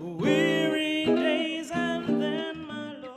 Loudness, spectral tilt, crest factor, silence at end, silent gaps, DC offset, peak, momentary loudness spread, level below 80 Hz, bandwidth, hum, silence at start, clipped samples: -26 LUFS; -5 dB/octave; 16 dB; 0 s; none; under 0.1%; -12 dBFS; 12 LU; -64 dBFS; 13.5 kHz; none; 0 s; under 0.1%